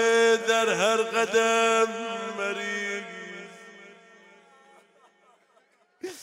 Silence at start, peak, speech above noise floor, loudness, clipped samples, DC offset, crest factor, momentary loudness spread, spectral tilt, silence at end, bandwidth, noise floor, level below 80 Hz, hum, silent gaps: 0 s; -10 dBFS; 40 dB; -24 LUFS; under 0.1%; under 0.1%; 18 dB; 20 LU; -2 dB/octave; 0 s; 16 kHz; -64 dBFS; -82 dBFS; none; none